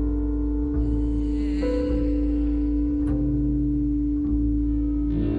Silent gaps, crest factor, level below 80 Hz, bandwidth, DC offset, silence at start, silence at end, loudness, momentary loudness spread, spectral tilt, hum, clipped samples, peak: none; 10 dB; -26 dBFS; 4.8 kHz; under 0.1%; 0 s; 0 s; -25 LUFS; 2 LU; -10.5 dB/octave; none; under 0.1%; -12 dBFS